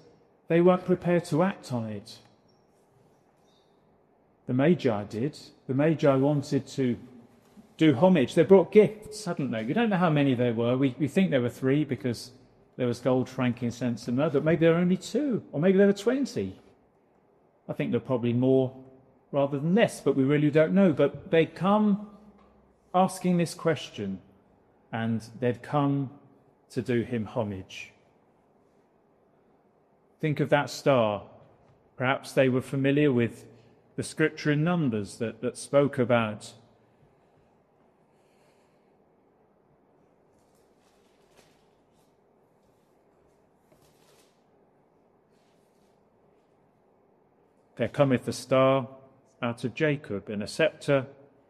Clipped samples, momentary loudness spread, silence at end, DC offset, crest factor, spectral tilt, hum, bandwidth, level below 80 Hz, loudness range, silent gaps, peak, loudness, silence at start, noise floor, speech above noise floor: under 0.1%; 13 LU; 0.35 s; under 0.1%; 22 dB; -7 dB/octave; none; 13 kHz; -68 dBFS; 9 LU; none; -6 dBFS; -26 LUFS; 0.5 s; -64 dBFS; 39 dB